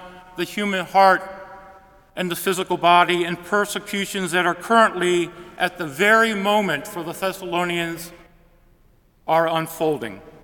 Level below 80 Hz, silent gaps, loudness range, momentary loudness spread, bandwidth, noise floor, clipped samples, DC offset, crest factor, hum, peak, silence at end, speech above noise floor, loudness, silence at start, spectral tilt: -58 dBFS; none; 5 LU; 15 LU; 18 kHz; -56 dBFS; under 0.1%; under 0.1%; 20 dB; none; 0 dBFS; 0.15 s; 36 dB; -20 LUFS; 0 s; -4 dB/octave